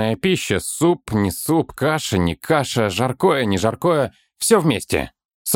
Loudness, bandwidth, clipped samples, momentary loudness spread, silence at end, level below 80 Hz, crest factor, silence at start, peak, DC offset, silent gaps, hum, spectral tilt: -19 LUFS; 17.5 kHz; under 0.1%; 6 LU; 0 s; -46 dBFS; 18 dB; 0 s; -2 dBFS; under 0.1%; 5.25-5.45 s; none; -4.5 dB/octave